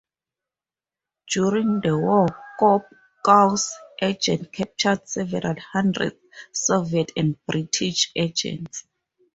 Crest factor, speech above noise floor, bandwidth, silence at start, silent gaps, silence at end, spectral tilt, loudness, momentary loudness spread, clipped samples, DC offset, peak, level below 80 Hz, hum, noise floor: 20 dB; over 68 dB; 8.2 kHz; 1.25 s; none; 0.55 s; -4 dB/octave; -22 LUFS; 9 LU; under 0.1%; under 0.1%; -2 dBFS; -60 dBFS; none; under -90 dBFS